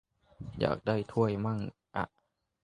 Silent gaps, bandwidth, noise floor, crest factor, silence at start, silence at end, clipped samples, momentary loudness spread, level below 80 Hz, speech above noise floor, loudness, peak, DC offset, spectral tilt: none; 10.5 kHz; -79 dBFS; 24 dB; 0.4 s; 0.6 s; under 0.1%; 12 LU; -58 dBFS; 48 dB; -33 LUFS; -10 dBFS; under 0.1%; -8.5 dB/octave